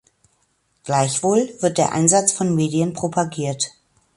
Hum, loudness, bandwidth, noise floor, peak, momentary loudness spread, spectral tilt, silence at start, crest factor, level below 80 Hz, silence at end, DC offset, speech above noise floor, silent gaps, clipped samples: none; -19 LUFS; 11.5 kHz; -66 dBFS; -2 dBFS; 9 LU; -4.5 dB/octave; 0.85 s; 18 dB; -60 dBFS; 0.45 s; under 0.1%; 47 dB; none; under 0.1%